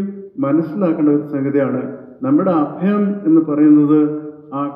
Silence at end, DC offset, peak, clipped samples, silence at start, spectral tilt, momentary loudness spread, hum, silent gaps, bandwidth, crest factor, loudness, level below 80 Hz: 0 s; under 0.1%; -2 dBFS; under 0.1%; 0 s; -12 dB/octave; 13 LU; none; none; 3.4 kHz; 14 dB; -16 LUFS; -70 dBFS